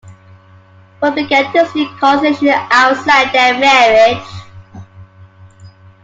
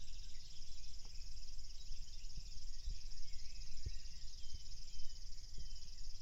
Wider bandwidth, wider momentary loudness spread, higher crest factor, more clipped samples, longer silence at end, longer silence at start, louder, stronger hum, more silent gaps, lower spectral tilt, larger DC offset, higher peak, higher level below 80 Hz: first, 9 kHz vs 7.8 kHz; first, 9 LU vs 4 LU; about the same, 14 dB vs 12 dB; neither; first, 0.35 s vs 0 s; about the same, 0.05 s vs 0 s; first, -11 LUFS vs -54 LUFS; neither; neither; first, -3.5 dB/octave vs -2 dB/octave; neither; first, 0 dBFS vs -26 dBFS; about the same, -52 dBFS vs -48 dBFS